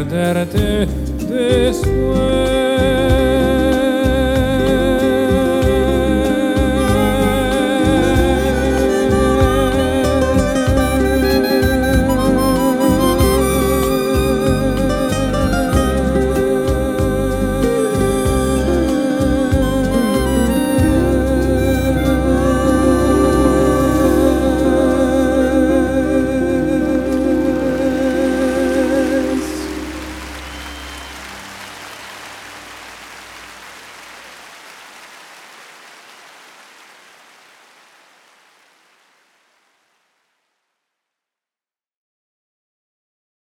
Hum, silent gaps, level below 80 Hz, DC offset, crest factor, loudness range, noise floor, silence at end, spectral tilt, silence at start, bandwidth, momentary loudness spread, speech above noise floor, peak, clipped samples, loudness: none; none; -26 dBFS; under 0.1%; 16 dB; 17 LU; under -90 dBFS; 7.75 s; -6 dB/octave; 0 s; 17 kHz; 17 LU; over 76 dB; 0 dBFS; under 0.1%; -15 LUFS